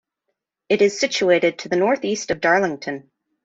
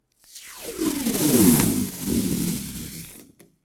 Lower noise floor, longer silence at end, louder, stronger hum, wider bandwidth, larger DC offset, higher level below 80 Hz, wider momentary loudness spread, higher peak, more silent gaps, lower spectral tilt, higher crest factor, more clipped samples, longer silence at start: first, -78 dBFS vs -50 dBFS; about the same, 0.45 s vs 0.4 s; first, -19 LUFS vs -22 LUFS; neither; second, 8 kHz vs 19.5 kHz; neither; second, -62 dBFS vs -44 dBFS; second, 10 LU vs 22 LU; about the same, -4 dBFS vs -2 dBFS; neither; about the same, -4 dB/octave vs -4.5 dB/octave; second, 16 dB vs 22 dB; neither; first, 0.7 s vs 0.35 s